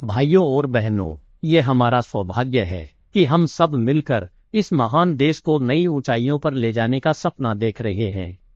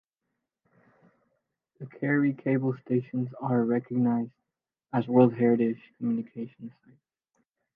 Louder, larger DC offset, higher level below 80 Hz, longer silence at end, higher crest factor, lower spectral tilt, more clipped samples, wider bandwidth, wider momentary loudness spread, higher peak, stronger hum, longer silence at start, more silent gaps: first, -20 LUFS vs -27 LUFS; neither; first, -50 dBFS vs -76 dBFS; second, 0.2 s vs 1.05 s; about the same, 18 dB vs 20 dB; second, -7.5 dB/octave vs -11.5 dB/octave; neither; first, 7.8 kHz vs 3.7 kHz; second, 8 LU vs 18 LU; first, -2 dBFS vs -8 dBFS; neither; second, 0 s vs 1.8 s; neither